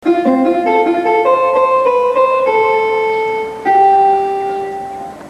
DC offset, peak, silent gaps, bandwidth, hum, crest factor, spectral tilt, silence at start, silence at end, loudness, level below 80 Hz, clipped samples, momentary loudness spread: under 0.1%; -2 dBFS; none; 11.5 kHz; none; 12 dB; -5.5 dB/octave; 0 s; 0 s; -13 LUFS; -54 dBFS; under 0.1%; 9 LU